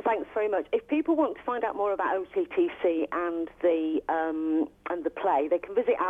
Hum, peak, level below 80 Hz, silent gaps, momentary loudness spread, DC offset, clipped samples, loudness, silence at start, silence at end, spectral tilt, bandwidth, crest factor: none; -14 dBFS; -64 dBFS; none; 4 LU; under 0.1%; under 0.1%; -28 LUFS; 0 s; 0 s; -7 dB/octave; 3.8 kHz; 14 dB